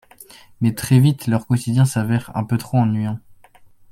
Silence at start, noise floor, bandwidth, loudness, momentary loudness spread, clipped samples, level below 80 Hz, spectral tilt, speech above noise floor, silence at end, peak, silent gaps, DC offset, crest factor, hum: 0.2 s; -48 dBFS; 16 kHz; -19 LUFS; 8 LU; under 0.1%; -52 dBFS; -7 dB/octave; 30 dB; 0.6 s; -2 dBFS; none; under 0.1%; 18 dB; none